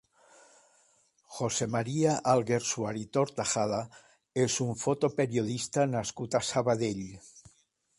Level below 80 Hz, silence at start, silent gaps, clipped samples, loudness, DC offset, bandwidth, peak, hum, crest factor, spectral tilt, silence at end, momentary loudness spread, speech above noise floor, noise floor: -64 dBFS; 1.3 s; none; under 0.1%; -30 LUFS; under 0.1%; 11.5 kHz; -12 dBFS; none; 18 dB; -4.5 dB/octave; 0.6 s; 9 LU; 39 dB; -69 dBFS